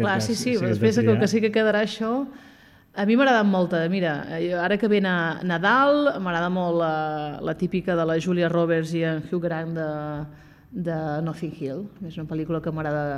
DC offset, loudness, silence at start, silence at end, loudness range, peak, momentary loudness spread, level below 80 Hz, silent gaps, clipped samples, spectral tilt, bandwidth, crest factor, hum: under 0.1%; -23 LUFS; 0 s; 0 s; 8 LU; -6 dBFS; 12 LU; -56 dBFS; none; under 0.1%; -6 dB/octave; 14 kHz; 16 dB; none